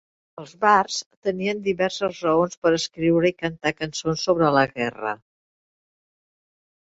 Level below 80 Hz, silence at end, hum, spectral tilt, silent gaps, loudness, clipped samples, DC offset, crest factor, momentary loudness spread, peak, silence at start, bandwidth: -58 dBFS; 1.7 s; none; -4.5 dB/octave; 1.06-1.11 s, 1.17-1.22 s, 2.57-2.62 s; -22 LUFS; under 0.1%; under 0.1%; 20 dB; 10 LU; -4 dBFS; 0.4 s; 8 kHz